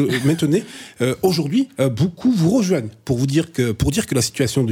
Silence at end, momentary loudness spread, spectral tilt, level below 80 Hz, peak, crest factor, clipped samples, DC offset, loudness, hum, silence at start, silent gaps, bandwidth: 0 s; 6 LU; -5.5 dB/octave; -42 dBFS; -4 dBFS; 14 dB; under 0.1%; under 0.1%; -19 LUFS; none; 0 s; none; 17.5 kHz